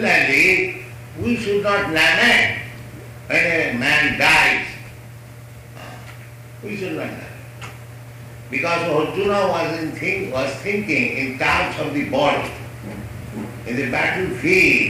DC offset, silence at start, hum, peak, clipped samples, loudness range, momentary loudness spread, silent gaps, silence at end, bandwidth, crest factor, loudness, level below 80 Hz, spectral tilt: under 0.1%; 0 s; none; -4 dBFS; under 0.1%; 13 LU; 24 LU; none; 0 s; 15.5 kHz; 16 dB; -18 LUFS; -46 dBFS; -4 dB/octave